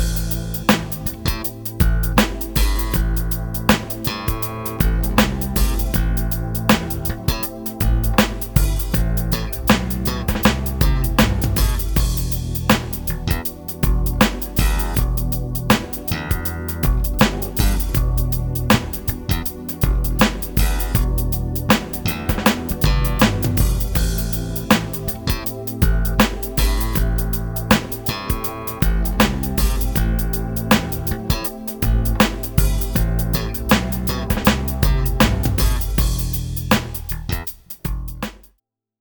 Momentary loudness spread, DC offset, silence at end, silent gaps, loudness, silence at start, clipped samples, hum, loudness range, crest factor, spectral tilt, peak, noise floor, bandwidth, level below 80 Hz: 6 LU; under 0.1%; 0.65 s; none; -20 LUFS; 0 s; under 0.1%; none; 1 LU; 18 dB; -5 dB/octave; 0 dBFS; -67 dBFS; over 20 kHz; -22 dBFS